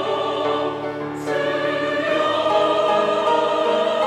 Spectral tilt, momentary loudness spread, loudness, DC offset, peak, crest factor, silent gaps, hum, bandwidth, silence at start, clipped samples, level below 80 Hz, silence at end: -4.5 dB/octave; 7 LU; -20 LUFS; under 0.1%; -6 dBFS; 14 dB; none; none; 12 kHz; 0 s; under 0.1%; -62 dBFS; 0 s